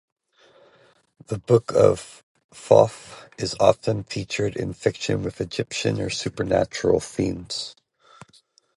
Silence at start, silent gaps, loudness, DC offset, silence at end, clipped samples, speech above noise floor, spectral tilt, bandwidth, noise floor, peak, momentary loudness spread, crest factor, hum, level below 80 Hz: 1.3 s; 2.23-2.35 s, 2.44-2.49 s; -23 LUFS; under 0.1%; 1.05 s; under 0.1%; 37 dB; -5.5 dB/octave; 11.5 kHz; -59 dBFS; 0 dBFS; 15 LU; 24 dB; none; -50 dBFS